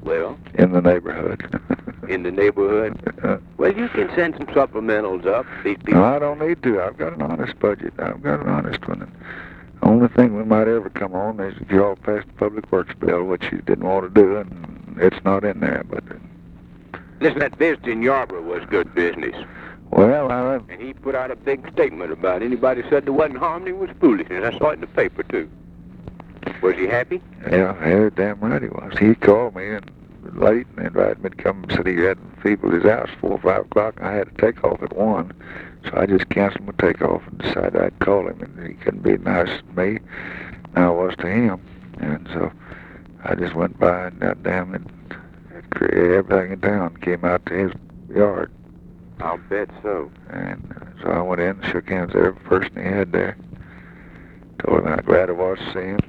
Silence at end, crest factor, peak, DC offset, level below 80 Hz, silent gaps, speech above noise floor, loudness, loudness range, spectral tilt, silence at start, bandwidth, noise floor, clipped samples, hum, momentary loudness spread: 0.05 s; 20 dB; 0 dBFS; under 0.1%; -46 dBFS; none; 23 dB; -20 LUFS; 4 LU; -9 dB/octave; 0 s; 6.4 kHz; -42 dBFS; under 0.1%; none; 15 LU